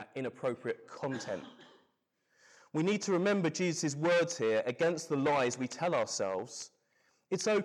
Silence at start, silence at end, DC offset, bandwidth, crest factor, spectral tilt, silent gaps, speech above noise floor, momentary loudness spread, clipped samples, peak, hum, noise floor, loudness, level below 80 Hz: 0 s; 0 s; under 0.1%; 12.5 kHz; 12 dB; -4.5 dB/octave; none; 45 dB; 11 LU; under 0.1%; -22 dBFS; none; -77 dBFS; -33 LUFS; -82 dBFS